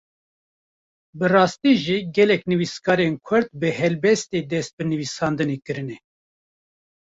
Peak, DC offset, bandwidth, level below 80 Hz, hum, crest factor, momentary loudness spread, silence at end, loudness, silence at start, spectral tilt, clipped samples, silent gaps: -4 dBFS; under 0.1%; 8 kHz; -60 dBFS; none; 20 dB; 9 LU; 1.25 s; -21 LUFS; 1.15 s; -5.5 dB/octave; under 0.1%; 4.73-4.78 s